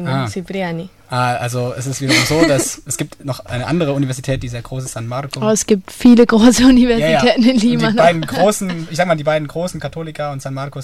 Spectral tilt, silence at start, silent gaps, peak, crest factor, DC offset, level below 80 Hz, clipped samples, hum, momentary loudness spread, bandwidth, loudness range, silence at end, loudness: -5 dB/octave; 0 s; none; 0 dBFS; 14 dB; under 0.1%; -38 dBFS; under 0.1%; none; 15 LU; 15 kHz; 7 LU; 0 s; -15 LUFS